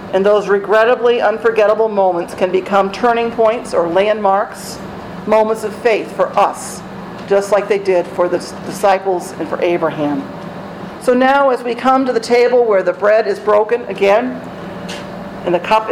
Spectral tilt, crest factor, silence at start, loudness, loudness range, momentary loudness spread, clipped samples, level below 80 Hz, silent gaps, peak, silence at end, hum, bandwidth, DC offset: -5 dB/octave; 12 dB; 0 s; -14 LUFS; 4 LU; 15 LU; under 0.1%; -50 dBFS; none; -2 dBFS; 0 s; none; 15.5 kHz; under 0.1%